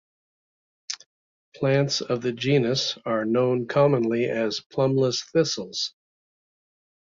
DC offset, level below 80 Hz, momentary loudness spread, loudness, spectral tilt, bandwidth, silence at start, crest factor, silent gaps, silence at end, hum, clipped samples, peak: under 0.1%; -66 dBFS; 9 LU; -24 LUFS; -5 dB/octave; 7.6 kHz; 0.9 s; 18 dB; 1.06-1.52 s, 4.66-4.70 s; 1.15 s; none; under 0.1%; -8 dBFS